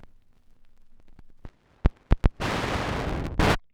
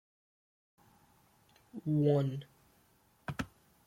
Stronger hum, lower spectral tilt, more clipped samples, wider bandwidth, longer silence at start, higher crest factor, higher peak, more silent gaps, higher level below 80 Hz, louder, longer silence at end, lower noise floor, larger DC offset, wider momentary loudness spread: neither; second, -6 dB/octave vs -8.5 dB/octave; neither; about the same, 15.5 kHz vs 15.5 kHz; second, 0.05 s vs 1.75 s; first, 24 dB vs 18 dB; first, -4 dBFS vs -20 dBFS; neither; first, -30 dBFS vs -66 dBFS; first, -27 LUFS vs -35 LUFS; second, 0.15 s vs 0.4 s; second, -54 dBFS vs -69 dBFS; neither; second, 6 LU vs 17 LU